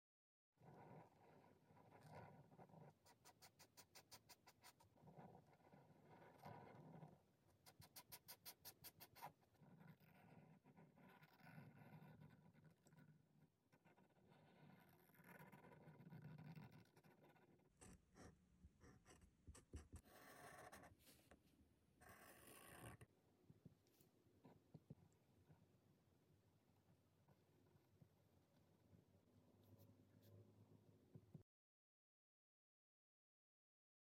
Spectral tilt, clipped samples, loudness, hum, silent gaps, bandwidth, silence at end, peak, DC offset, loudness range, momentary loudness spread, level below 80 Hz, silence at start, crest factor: -4.5 dB/octave; under 0.1%; -66 LUFS; none; none; 16.5 kHz; 2.75 s; -44 dBFS; under 0.1%; 5 LU; 7 LU; -82 dBFS; 0.55 s; 24 dB